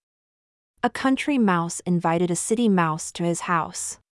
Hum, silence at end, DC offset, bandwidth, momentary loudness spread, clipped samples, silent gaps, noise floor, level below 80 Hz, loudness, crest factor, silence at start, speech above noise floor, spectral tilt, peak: none; 0.2 s; under 0.1%; 12 kHz; 7 LU; under 0.1%; none; under -90 dBFS; -62 dBFS; -23 LUFS; 16 dB; 0.85 s; over 67 dB; -5 dB/octave; -8 dBFS